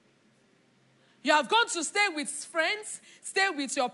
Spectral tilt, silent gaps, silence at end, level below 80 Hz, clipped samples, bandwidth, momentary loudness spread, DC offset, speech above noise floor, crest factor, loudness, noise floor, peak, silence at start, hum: -0.5 dB/octave; none; 0 s; under -90 dBFS; under 0.1%; 11.5 kHz; 10 LU; under 0.1%; 36 dB; 20 dB; -27 LUFS; -65 dBFS; -10 dBFS; 1.25 s; none